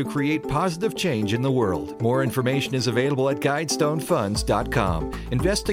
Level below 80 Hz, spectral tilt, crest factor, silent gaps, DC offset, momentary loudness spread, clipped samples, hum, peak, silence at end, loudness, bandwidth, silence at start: -38 dBFS; -5.5 dB/octave; 14 dB; none; under 0.1%; 3 LU; under 0.1%; none; -8 dBFS; 0 s; -23 LUFS; 16.5 kHz; 0 s